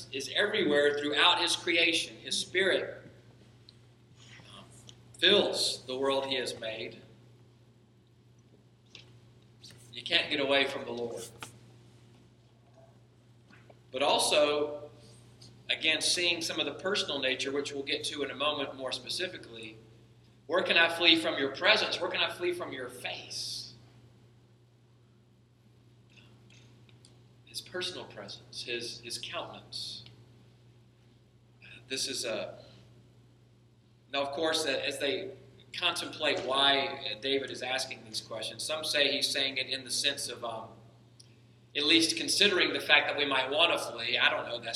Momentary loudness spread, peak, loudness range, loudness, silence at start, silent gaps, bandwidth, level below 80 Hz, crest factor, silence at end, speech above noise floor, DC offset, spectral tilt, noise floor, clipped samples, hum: 18 LU; -6 dBFS; 14 LU; -29 LUFS; 0 s; none; 14.5 kHz; -72 dBFS; 28 dB; 0 s; 32 dB; under 0.1%; -2 dB/octave; -62 dBFS; under 0.1%; none